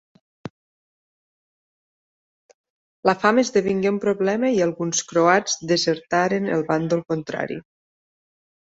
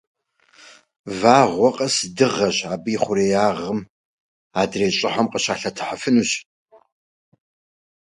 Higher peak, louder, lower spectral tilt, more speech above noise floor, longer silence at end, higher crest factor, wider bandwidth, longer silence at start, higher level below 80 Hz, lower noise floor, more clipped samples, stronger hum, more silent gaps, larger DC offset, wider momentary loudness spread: about the same, -2 dBFS vs 0 dBFS; about the same, -21 LUFS vs -20 LUFS; about the same, -4.5 dB/octave vs -4 dB/octave; first, over 69 dB vs 34 dB; second, 1 s vs 1.7 s; about the same, 22 dB vs 22 dB; second, 8 kHz vs 11.5 kHz; second, 0.45 s vs 1.05 s; second, -64 dBFS vs -58 dBFS; first, under -90 dBFS vs -53 dBFS; neither; neither; first, 0.50-2.64 s, 2.70-3.03 s vs 3.90-4.51 s; neither; about the same, 12 LU vs 12 LU